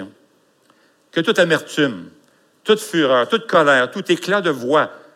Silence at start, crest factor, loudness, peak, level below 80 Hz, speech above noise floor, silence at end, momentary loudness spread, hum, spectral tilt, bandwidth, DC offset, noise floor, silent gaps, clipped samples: 0 s; 16 dB; -17 LUFS; -2 dBFS; -74 dBFS; 41 dB; 0.2 s; 8 LU; none; -4.5 dB/octave; 16 kHz; under 0.1%; -57 dBFS; none; under 0.1%